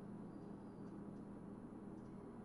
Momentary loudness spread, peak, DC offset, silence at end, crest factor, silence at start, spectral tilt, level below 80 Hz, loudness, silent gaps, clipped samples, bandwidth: 1 LU; -42 dBFS; under 0.1%; 0 s; 12 dB; 0 s; -9 dB/octave; -72 dBFS; -54 LUFS; none; under 0.1%; 10.5 kHz